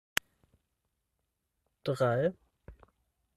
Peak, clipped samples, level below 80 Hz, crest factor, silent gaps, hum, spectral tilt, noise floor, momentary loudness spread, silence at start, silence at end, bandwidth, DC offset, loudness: -6 dBFS; under 0.1%; -64 dBFS; 32 dB; none; none; -5 dB/octave; -83 dBFS; 8 LU; 1.85 s; 0.65 s; 13.5 kHz; under 0.1%; -32 LUFS